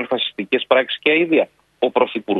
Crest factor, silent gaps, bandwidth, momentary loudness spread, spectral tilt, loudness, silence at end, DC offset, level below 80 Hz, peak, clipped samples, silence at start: 18 dB; none; 4.7 kHz; 6 LU; -6.5 dB/octave; -18 LUFS; 0 s; under 0.1%; -66 dBFS; 0 dBFS; under 0.1%; 0 s